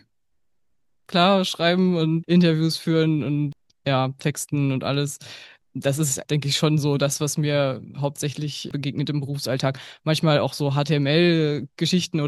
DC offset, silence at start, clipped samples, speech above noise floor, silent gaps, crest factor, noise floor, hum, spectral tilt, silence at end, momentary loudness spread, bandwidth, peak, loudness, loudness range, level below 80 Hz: under 0.1%; 1.1 s; under 0.1%; 58 dB; none; 20 dB; -80 dBFS; none; -5.5 dB/octave; 0 s; 10 LU; 12.5 kHz; -4 dBFS; -22 LUFS; 4 LU; -64 dBFS